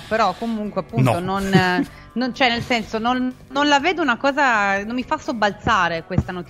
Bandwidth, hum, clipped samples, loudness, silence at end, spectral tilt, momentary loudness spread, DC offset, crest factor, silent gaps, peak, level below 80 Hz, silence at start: 15.5 kHz; none; under 0.1%; -20 LUFS; 0 s; -5.5 dB/octave; 8 LU; under 0.1%; 18 dB; none; -2 dBFS; -44 dBFS; 0 s